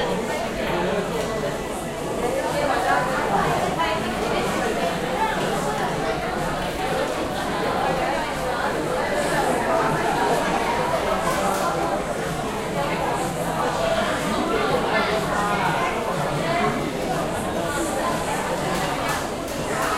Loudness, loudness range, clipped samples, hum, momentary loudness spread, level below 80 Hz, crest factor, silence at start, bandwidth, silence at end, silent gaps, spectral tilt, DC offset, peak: -23 LUFS; 2 LU; under 0.1%; none; 4 LU; -42 dBFS; 16 dB; 0 s; 16 kHz; 0 s; none; -4.5 dB/octave; under 0.1%; -8 dBFS